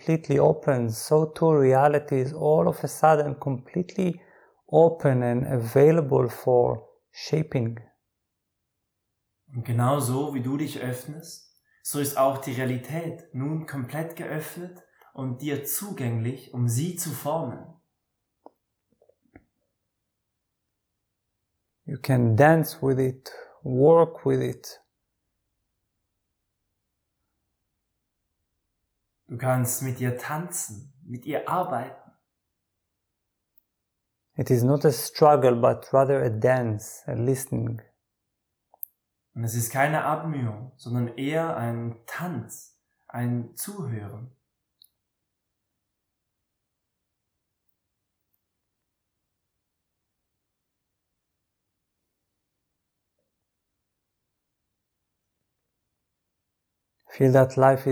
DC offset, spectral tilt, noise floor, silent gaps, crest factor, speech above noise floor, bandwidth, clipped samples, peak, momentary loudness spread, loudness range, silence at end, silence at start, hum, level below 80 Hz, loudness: under 0.1%; -6.5 dB/octave; -80 dBFS; none; 22 dB; 56 dB; over 20 kHz; under 0.1%; -4 dBFS; 19 LU; 12 LU; 0 s; 0.05 s; none; -66 dBFS; -24 LUFS